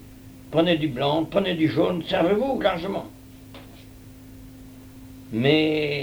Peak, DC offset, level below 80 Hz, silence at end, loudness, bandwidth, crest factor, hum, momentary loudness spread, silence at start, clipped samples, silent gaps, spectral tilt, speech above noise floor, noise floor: -6 dBFS; under 0.1%; -50 dBFS; 0 s; -23 LUFS; over 20 kHz; 20 dB; none; 24 LU; 0 s; under 0.1%; none; -7 dB/octave; 22 dB; -45 dBFS